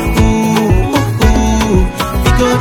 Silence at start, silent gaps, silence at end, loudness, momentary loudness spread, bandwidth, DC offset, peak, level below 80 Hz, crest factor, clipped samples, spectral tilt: 0 s; none; 0 s; -12 LUFS; 3 LU; 18.5 kHz; under 0.1%; 0 dBFS; -16 dBFS; 10 dB; under 0.1%; -6 dB/octave